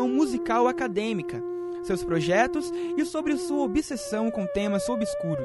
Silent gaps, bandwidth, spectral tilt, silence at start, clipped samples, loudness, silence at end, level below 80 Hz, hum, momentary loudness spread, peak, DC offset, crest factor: none; 11.5 kHz; -5.5 dB/octave; 0 s; under 0.1%; -27 LUFS; 0 s; -52 dBFS; none; 7 LU; -10 dBFS; under 0.1%; 16 dB